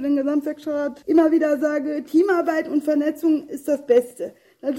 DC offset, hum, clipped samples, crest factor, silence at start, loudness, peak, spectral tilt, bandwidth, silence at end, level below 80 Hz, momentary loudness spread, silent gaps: under 0.1%; none; under 0.1%; 14 dB; 0 s; -21 LUFS; -6 dBFS; -5 dB/octave; 16 kHz; 0 s; -66 dBFS; 8 LU; none